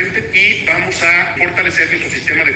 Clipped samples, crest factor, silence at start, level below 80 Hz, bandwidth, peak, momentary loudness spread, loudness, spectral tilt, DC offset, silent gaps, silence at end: under 0.1%; 12 dB; 0 s; -44 dBFS; 9.2 kHz; 0 dBFS; 4 LU; -11 LUFS; -3 dB/octave; under 0.1%; none; 0 s